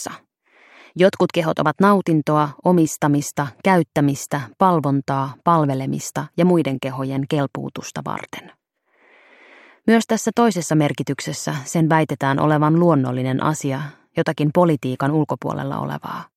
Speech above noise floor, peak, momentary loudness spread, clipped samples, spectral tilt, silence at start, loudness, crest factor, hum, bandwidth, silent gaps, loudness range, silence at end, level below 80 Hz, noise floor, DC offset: 41 dB; -2 dBFS; 11 LU; under 0.1%; -6 dB/octave; 0 s; -19 LUFS; 18 dB; none; 15.5 kHz; none; 5 LU; 0.15 s; -62 dBFS; -60 dBFS; under 0.1%